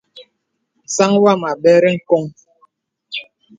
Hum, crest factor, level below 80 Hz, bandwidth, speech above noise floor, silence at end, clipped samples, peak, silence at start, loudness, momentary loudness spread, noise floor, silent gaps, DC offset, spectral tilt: none; 16 dB; -64 dBFS; 9.4 kHz; 57 dB; 0.35 s; under 0.1%; 0 dBFS; 0.15 s; -14 LUFS; 16 LU; -70 dBFS; none; under 0.1%; -5 dB/octave